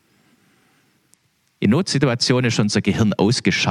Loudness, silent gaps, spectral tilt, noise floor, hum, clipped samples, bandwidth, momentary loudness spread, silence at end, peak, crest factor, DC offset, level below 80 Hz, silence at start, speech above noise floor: -18 LUFS; none; -5 dB/octave; -61 dBFS; none; under 0.1%; 12 kHz; 2 LU; 0 s; -4 dBFS; 16 dB; under 0.1%; -54 dBFS; 1.6 s; 43 dB